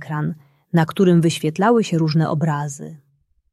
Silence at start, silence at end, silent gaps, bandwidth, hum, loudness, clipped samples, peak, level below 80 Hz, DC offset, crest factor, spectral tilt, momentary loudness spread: 0 s; 0.55 s; none; 13 kHz; none; -19 LUFS; under 0.1%; -2 dBFS; -60 dBFS; under 0.1%; 16 dB; -6.5 dB/octave; 15 LU